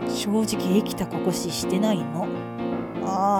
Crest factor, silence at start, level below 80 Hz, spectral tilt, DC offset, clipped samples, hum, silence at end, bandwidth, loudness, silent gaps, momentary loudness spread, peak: 16 dB; 0 s; -54 dBFS; -5.5 dB/octave; under 0.1%; under 0.1%; none; 0 s; 18 kHz; -25 LUFS; none; 6 LU; -8 dBFS